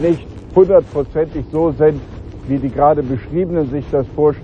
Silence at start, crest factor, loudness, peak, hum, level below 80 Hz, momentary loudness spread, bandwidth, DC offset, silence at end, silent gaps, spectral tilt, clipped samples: 0 s; 14 dB; -16 LUFS; 0 dBFS; none; -34 dBFS; 10 LU; 6.8 kHz; under 0.1%; 0 s; none; -10 dB/octave; under 0.1%